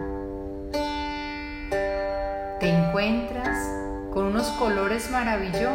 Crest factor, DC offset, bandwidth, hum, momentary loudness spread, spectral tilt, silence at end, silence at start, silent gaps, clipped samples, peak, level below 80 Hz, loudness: 16 dB; under 0.1%; 16 kHz; none; 9 LU; -5.5 dB/octave; 0 s; 0 s; none; under 0.1%; -10 dBFS; -40 dBFS; -27 LUFS